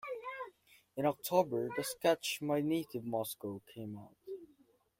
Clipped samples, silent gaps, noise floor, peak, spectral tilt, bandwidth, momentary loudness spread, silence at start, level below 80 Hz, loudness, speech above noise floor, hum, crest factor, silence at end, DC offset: under 0.1%; none; -69 dBFS; -16 dBFS; -4.5 dB/octave; 16.5 kHz; 17 LU; 0.05 s; -78 dBFS; -36 LUFS; 34 dB; none; 22 dB; 0.55 s; under 0.1%